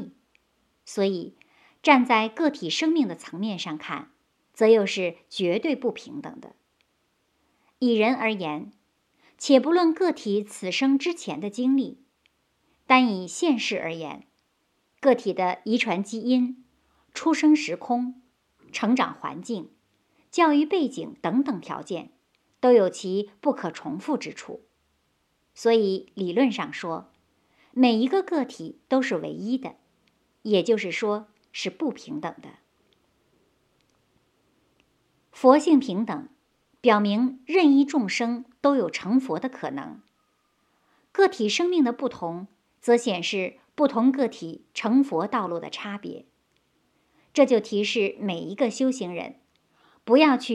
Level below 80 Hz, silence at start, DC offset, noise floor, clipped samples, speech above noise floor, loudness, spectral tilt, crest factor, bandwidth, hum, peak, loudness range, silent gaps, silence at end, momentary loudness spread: -76 dBFS; 0 s; under 0.1%; -71 dBFS; under 0.1%; 48 dB; -24 LUFS; -5 dB/octave; 24 dB; 11 kHz; none; -2 dBFS; 5 LU; none; 0 s; 16 LU